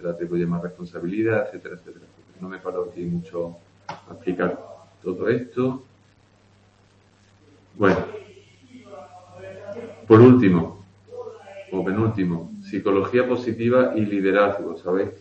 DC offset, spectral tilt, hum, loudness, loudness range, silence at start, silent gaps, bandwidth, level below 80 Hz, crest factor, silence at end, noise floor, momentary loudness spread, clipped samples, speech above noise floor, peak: under 0.1%; -9 dB/octave; none; -21 LUFS; 11 LU; 0 s; none; 8 kHz; -58 dBFS; 22 dB; 0.05 s; -57 dBFS; 21 LU; under 0.1%; 36 dB; 0 dBFS